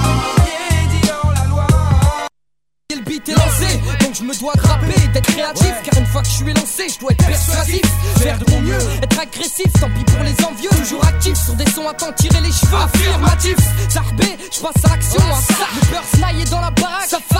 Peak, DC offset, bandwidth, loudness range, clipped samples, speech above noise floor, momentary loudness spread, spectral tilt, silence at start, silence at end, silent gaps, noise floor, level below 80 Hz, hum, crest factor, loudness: 0 dBFS; under 0.1%; 16.5 kHz; 2 LU; under 0.1%; 62 dB; 4 LU; -4.5 dB/octave; 0 s; 0 s; none; -76 dBFS; -20 dBFS; none; 14 dB; -15 LUFS